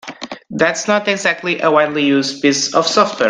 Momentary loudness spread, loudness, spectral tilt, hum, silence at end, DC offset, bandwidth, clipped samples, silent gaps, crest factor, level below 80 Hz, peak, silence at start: 5 LU; -15 LUFS; -3 dB/octave; none; 0 s; under 0.1%; 10 kHz; under 0.1%; none; 16 dB; -60 dBFS; 0 dBFS; 0.05 s